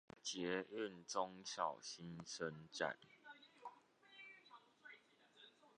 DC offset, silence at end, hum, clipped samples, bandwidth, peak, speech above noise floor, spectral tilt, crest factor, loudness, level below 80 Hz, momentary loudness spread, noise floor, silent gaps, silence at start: under 0.1%; 0.1 s; none; under 0.1%; 10 kHz; -26 dBFS; 23 dB; -3 dB/octave; 24 dB; -47 LUFS; -86 dBFS; 20 LU; -70 dBFS; none; 0.15 s